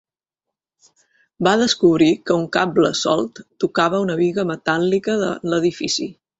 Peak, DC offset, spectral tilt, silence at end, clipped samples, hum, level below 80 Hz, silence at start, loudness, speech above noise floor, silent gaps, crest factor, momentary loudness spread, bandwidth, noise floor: -2 dBFS; under 0.1%; -4.5 dB/octave; 0.25 s; under 0.1%; none; -58 dBFS; 1.4 s; -19 LUFS; 66 dB; none; 18 dB; 7 LU; 8 kHz; -84 dBFS